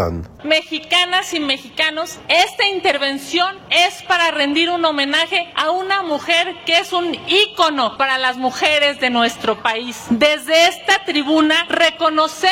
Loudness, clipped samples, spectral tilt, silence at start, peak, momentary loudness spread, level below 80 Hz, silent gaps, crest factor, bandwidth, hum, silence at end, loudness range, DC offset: -16 LUFS; under 0.1%; -2.5 dB/octave; 0 s; -2 dBFS; 6 LU; -50 dBFS; none; 16 dB; 16.5 kHz; none; 0 s; 1 LU; under 0.1%